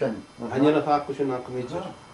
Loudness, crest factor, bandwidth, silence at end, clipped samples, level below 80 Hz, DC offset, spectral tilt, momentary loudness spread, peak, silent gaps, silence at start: -26 LUFS; 18 dB; 11.5 kHz; 0 s; under 0.1%; -60 dBFS; under 0.1%; -7 dB/octave; 12 LU; -8 dBFS; none; 0 s